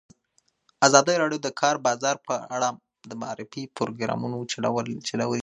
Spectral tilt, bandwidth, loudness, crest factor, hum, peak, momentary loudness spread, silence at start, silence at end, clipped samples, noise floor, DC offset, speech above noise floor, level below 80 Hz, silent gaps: -3.5 dB/octave; 11 kHz; -25 LUFS; 26 dB; none; 0 dBFS; 17 LU; 0.8 s; 0 s; under 0.1%; -69 dBFS; under 0.1%; 44 dB; -72 dBFS; none